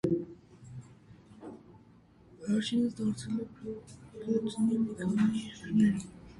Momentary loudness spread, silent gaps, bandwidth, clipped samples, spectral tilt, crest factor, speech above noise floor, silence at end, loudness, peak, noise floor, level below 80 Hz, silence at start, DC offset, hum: 21 LU; none; 11.5 kHz; under 0.1%; -6.5 dB/octave; 16 dB; 28 dB; 0 s; -32 LUFS; -16 dBFS; -59 dBFS; -62 dBFS; 0.05 s; under 0.1%; none